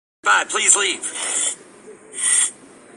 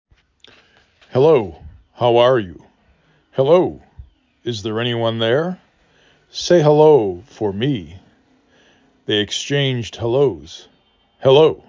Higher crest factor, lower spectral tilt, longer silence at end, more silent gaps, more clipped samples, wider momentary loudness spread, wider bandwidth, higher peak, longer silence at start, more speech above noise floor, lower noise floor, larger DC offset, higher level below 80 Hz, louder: about the same, 22 dB vs 18 dB; second, 2 dB/octave vs -6 dB/octave; first, 0.45 s vs 0.15 s; neither; neither; second, 9 LU vs 18 LU; first, 12.5 kHz vs 7.6 kHz; about the same, 0 dBFS vs -2 dBFS; second, 0.25 s vs 1.15 s; second, 25 dB vs 41 dB; second, -43 dBFS vs -57 dBFS; neither; second, -74 dBFS vs -50 dBFS; about the same, -17 LUFS vs -17 LUFS